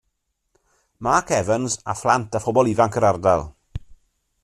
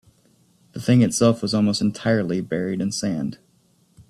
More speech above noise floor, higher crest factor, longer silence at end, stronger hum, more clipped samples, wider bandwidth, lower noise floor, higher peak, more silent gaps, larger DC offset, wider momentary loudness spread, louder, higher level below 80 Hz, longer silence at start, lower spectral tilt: first, 54 dB vs 40 dB; about the same, 20 dB vs 18 dB; first, 0.5 s vs 0.1 s; neither; neither; about the same, 13 kHz vs 13.5 kHz; first, -74 dBFS vs -61 dBFS; about the same, -2 dBFS vs -4 dBFS; neither; neither; first, 18 LU vs 11 LU; about the same, -20 LUFS vs -21 LUFS; first, -46 dBFS vs -56 dBFS; first, 1 s vs 0.75 s; about the same, -5 dB/octave vs -5.5 dB/octave